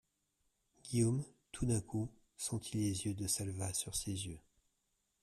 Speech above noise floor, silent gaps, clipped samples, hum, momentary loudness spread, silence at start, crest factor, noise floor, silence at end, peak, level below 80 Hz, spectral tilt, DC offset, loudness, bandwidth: 45 dB; none; under 0.1%; none; 11 LU; 0.85 s; 18 dB; -83 dBFS; 0.85 s; -22 dBFS; -60 dBFS; -5 dB/octave; under 0.1%; -39 LUFS; 14.5 kHz